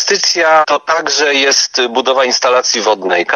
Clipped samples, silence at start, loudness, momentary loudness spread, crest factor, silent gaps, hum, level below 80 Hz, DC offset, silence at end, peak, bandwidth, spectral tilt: under 0.1%; 0 s; -11 LUFS; 4 LU; 12 dB; none; none; -68 dBFS; under 0.1%; 0 s; 0 dBFS; 12.5 kHz; 0 dB/octave